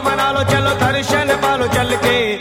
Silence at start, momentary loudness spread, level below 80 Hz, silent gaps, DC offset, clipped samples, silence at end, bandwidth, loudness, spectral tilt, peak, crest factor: 0 s; 1 LU; -38 dBFS; none; under 0.1%; under 0.1%; 0 s; 17 kHz; -15 LUFS; -4.5 dB/octave; -4 dBFS; 12 dB